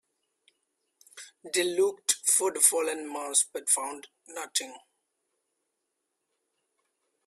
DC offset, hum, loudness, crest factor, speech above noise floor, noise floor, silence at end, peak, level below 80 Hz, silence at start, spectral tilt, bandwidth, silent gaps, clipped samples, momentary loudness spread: under 0.1%; none; -26 LUFS; 26 dB; 53 dB; -82 dBFS; 2.5 s; -4 dBFS; -84 dBFS; 1.15 s; 0 dB/octave; 15.5 kHz; none; under 0.1%; 22 LU